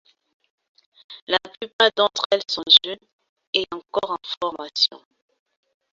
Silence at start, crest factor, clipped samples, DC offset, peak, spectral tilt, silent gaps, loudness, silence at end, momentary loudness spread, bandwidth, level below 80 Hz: 1.1 s; 24 dB; under 0.1%; under 0.1%; -2 dBFS; -1.5 dB/octave; 1.22-1.27 s, 1.73-1.79 s, 2.26-2.30 s, 3.13-3.19 s, 3.29-3.36 s, 3.47-3.53 s, 4.37-4.41 s; -20 LUFS; 0.95 s; 16 LU; 7.8 kHz; -68 dBFS